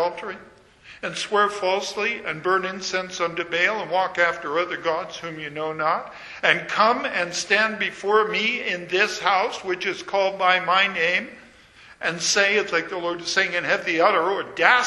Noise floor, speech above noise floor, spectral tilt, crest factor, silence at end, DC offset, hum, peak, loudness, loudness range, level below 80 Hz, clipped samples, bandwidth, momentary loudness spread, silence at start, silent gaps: -49 dBFS; 27 dB; -2 dB/octave; 22 dB; 0 s; under 0.1%; none; 0 dBFS; -22 LUFS; 3 LU; -64 dBFS; under 0.1%; 11.5 kHz; 9 LU; 0 s; none